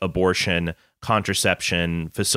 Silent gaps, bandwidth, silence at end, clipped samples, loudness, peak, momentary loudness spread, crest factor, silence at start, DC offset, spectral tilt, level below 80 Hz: none; 16 kHz; 0 s; under 0.1%; -22 LUFS; -4 dBFS; 7 LU; 18 dB; 0 s; under 0.1%; -3.5 dB/octave; -44 dBFS